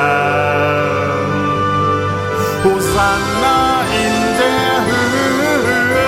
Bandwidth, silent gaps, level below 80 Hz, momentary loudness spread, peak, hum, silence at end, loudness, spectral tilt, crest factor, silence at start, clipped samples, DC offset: 16.5 kHz; none; -38 dBFS; 3 LU; -2 dBFS; none; 0 s; -14 LUFS; -4.5 dB/octave; 12 dB; 0 s; under 0.1%; under 0.1%